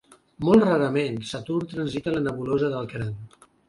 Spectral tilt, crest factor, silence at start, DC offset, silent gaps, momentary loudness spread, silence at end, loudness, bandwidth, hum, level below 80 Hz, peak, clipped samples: -7 dB/octave; 20 dB; 0.4 s; under 0.1%; none; 14 LU; 0.4 s; -24 LUFS; 11.5 kHz; none; -54 dBFS; -6 dBFS; under 0.1%